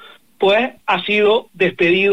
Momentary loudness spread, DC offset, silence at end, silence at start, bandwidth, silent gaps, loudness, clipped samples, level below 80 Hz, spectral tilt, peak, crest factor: 5 LU; 0.4%; 0 s; 0.4 s; 8.8 kHz; none; -16 LUFS; under 0.1%; -62 dBFS; -6 dB/octave; -4 dBFS; 12 dB